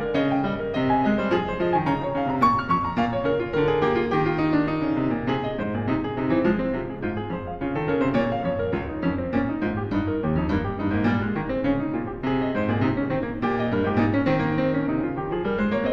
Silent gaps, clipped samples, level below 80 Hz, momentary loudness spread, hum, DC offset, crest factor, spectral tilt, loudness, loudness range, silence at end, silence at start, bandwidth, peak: none; under 0.1%; -42 dBFS; 5 LU; none; under 0.1%; 16 dB; -8.5 dB/octave; -24 LUFS; 3 LU; 0 s; 0 s; 7.4 kHz; -8 dBFS